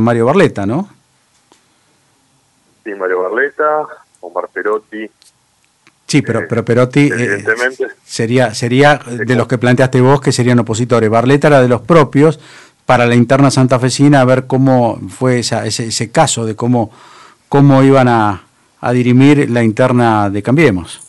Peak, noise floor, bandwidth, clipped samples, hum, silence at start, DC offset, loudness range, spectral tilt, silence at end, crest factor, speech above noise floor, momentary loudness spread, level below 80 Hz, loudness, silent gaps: 0 dBFS; -56 dBFS; 11.5 kHz; under 0.1%; none; 0 s; under 0.1%; 8 LU; -6 dB/octave; 0.1 s; 12 dB; 45 dB; 12 LU; -48 dBFS; -11 LUFS; none